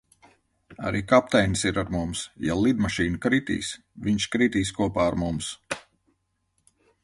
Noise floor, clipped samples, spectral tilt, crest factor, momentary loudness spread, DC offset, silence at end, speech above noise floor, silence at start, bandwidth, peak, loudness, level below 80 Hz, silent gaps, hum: -73 dBFS; under 0.1%; -5 dB/octave; 22 dB; 11 LU; under 0.1%; 1.25 s; 49 dB; 0.7 s; 11.5 kHz; -4 dBFS; -25 LUFS; -46 dBFS; none; none